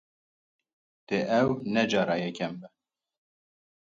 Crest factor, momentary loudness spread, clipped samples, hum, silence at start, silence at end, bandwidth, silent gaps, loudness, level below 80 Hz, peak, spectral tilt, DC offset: 20 dB; 10 LU; under 0.1%; none; 1.1 s; 1.25 s; 7.6 kHz; none; -28 LUFS; -68 dBFS; -12 dBFS; -5.5 dB/octave; under 0.1%